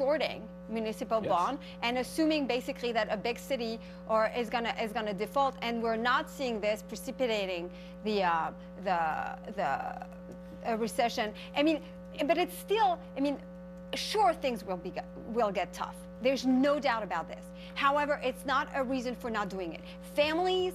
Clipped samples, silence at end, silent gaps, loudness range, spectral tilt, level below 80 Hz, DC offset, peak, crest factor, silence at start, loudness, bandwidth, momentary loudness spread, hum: under 0.1%; 0 s; none; 2 LU; -4.5 dB/octave; -58 dBFS; under 0.1%; -14 dBFS; 18 dB; 0 s; -32 LUFS; 14.5 kHz; 12 LU; none